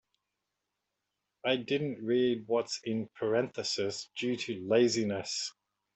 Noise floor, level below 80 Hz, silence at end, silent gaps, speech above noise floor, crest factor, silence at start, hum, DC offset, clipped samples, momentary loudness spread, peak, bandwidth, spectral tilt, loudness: -86 dBFS; -76 dBFS; 0.45 s; none; 54 dB; 18 dB; 1.45 s; none; under 0.1%; under 0.1%; 8 LU; -14 dBFS; 8.4 kHz; -4 dB/octave; -32 LUFS